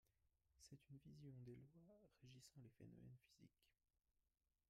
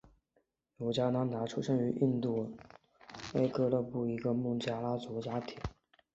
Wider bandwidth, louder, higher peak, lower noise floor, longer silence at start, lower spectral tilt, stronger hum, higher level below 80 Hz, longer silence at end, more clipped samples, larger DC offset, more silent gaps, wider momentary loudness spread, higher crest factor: first, 13.5 kHz vs 8 kHz; second, -65 LUFS vs -35 LUFS; second, -50 dBFS vs -18 dBFS; first, under -90 dBFS vs -78 dBFS; second, 0.05 s vs 0.8 s; second, -6 dB/octave vs -7.5 dB/octave; neither; second, -86 dBFS vs -60 dBFS; first, 0.95 s vs 0.45 s; neither; neither; neither; second, 6 LU vs 13 LU; about the same, 16 dB vs 18 dB